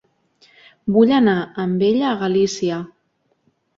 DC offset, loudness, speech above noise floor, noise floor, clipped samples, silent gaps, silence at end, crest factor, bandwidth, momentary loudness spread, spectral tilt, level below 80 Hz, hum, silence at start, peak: under 0.1%; -18 LUFS; 49 dB; -66 dBFS; under 0.1%; none; 0.9 s; 16 dB; 7.8 kHz; 13 LU; -6 dB/octave; -60 dBFS; none; 0.85 s; -2 dBFS